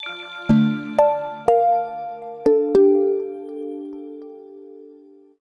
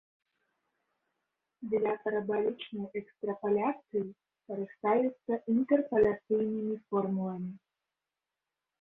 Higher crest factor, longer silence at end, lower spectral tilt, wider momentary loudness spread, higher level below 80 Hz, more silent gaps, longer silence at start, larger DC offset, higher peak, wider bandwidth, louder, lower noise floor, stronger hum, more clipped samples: about the same, 18 dB vs 18 dB; second, 0.5 s vs 1.25 s; second, -8 dB/octave vs -10 dB/octave; first, 20 LU vs 12 LU; first, -50 dBFS vs -68 dBFS; neither; second, 0 s vs 1.6 s; neither; first, -4 dBFS vs -14 dBFS; first, 11 kHz vs 3.9 kHz; first, -19 LUFS vs -32 LUFS; second, -48 dBFS vs -90 dBFS; neither; neither